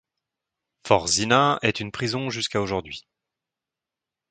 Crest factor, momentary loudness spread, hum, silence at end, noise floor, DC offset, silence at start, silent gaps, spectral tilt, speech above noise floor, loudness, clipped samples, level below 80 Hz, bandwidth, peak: 26 dB; 16 LU; none; 1.3 s; -88 dBFS; under 0.1%; 0.85 s; none; -3.5 dB/octave; 65 dB; -23 LUFS; under 0.1%; -54 dBFS; 9.6 kHz; 0 dBFS